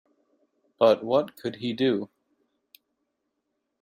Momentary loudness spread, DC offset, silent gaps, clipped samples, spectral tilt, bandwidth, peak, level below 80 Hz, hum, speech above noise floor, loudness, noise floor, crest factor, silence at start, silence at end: 12 LU; under 0.1%; none; under 0.1%; -6.5 dB/octave; 16 kHz; -6 dBFS; -74 dBFS; none; 55 dB; -25 LUFS; -80 dBFS; 22 dB; 0.8 s; 1.75 s